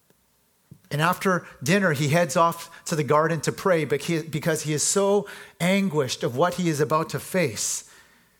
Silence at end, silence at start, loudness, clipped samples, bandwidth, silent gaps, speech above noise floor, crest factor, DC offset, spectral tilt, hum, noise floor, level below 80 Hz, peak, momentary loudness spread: 0.55 s; 0.9 s; -24 LUFS; under 0.1%; 19 kHz; none; 42 dB; 20 dB; under 0.1%; -4.5 dB/octave; none; -65 dBFS; -64 dBFS; -4 dBFS; 6 LU